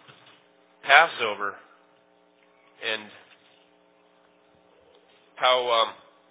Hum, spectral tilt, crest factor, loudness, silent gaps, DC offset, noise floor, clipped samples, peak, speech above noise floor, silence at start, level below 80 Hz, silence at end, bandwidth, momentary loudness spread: none; -5 dB/octave; 28 dB; -22 LUFS; none; under 0.1%; -61 dBFS; under 0.1%; 0 dBFS; 38 dB; 0.85 s; -86 dBFS; 0.35 s; 4 kHz; 16 LU